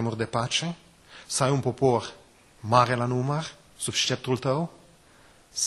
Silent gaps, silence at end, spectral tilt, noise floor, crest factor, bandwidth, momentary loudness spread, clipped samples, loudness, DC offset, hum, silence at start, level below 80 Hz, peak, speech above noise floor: none; 0 s; -4 dB/octave; -56 dBFS; 22 dB; 12.5 kHz; 14 LU; under 0.1%; -26 LUFS; under 0.1%; none; 0 s; -60 dBFS; -4 dBFS; 30 dB